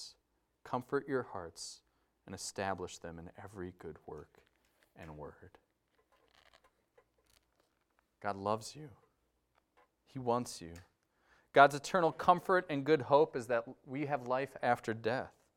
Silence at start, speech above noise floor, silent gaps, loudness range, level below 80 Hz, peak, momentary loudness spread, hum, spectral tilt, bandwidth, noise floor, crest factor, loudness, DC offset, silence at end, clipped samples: 0 s; 44 dB; none; 21 LU; -72 dBFS; -10 dBFS; 22 LU; none; -5 dB/octave; 16 kHz; -79 dBFS; 26 dB; -34 LUFS; under 0.1%; 0.3 s; under 0.1%